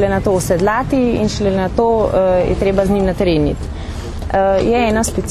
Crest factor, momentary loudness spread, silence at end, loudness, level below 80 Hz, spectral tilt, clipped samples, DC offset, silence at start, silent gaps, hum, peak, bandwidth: 14 dB; 6 LU; 0 s; -15 LUFS; -26 dBFS; -6 dB/octave; under 0.1%; under 0.1%; 0 s; none; none; 0 dBFS; 13.5 kHz